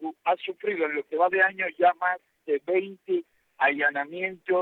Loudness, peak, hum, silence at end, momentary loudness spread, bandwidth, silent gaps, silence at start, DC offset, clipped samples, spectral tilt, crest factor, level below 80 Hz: -26 LUFS; -10 dBFS; none; 0 s; 8 LU; 4.2 kHz; none; 0 s; under 0.1%; under 0.1%; -7 dB/octave; 18 dB; -84 dBFS